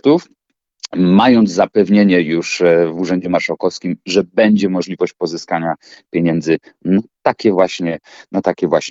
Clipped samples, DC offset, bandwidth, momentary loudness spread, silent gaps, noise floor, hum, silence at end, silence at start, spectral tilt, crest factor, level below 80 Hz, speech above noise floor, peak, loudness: under 0.1%; under 0.1%; 7.8 kHz; 12 LU; none; -36 dBFS; none; 0 s; 0.05 s; -6 dB/octave; 14 dB; -56 dBFS; 22 dB; 0 dBFS; -15 LUFS